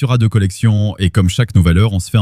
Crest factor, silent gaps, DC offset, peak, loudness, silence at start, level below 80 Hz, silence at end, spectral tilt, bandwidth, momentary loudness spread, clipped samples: 12 dB; none; under 0.1%; 0 dBFS; -14 LUFS; 0 s; -28 dBFS; 0 s; -6.5 dB/octave; 13.5 kHz; 3 LU; under 0.1%